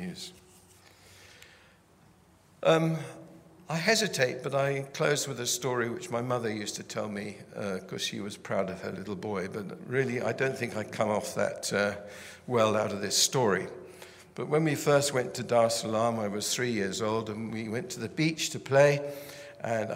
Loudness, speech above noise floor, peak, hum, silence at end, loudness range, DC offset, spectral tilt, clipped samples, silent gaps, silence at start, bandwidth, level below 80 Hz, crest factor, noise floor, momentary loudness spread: -29 LUFS; 31 dB; -8 dBFS; none; 0 s; 6 LU; under 0.1%; -4 dB/octave; under 0.1%; none; 0 s; 16 kHz; -70 dBFS; 22 dB; -60 dBFS; 14 LU